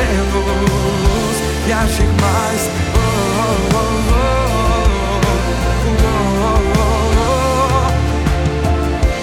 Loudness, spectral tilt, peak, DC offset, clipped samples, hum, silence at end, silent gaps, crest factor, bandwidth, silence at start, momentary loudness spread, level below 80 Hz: -15 LUFS; -5.5 dB/octave; -2 dBFS; under 0.1%; under 0.1%; none; 0 s; none; 12 dB; 16.5 kHz; 0 s; 2 LU; -18 dBFS